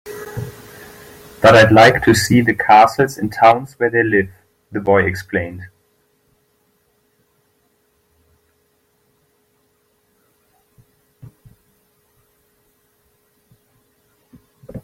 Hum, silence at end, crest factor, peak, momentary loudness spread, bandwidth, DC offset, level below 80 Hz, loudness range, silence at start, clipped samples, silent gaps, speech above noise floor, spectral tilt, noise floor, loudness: none; 0.05 s; 18 dB; 0 dBFS; 24 LU; 16.5 kHz; under 0.1%; -50 dBFS; 12 LU; 0.05 s; under 0.1%; none; 50 dB; -5.5 dB/octave; -62 dBFS; -13 LUFS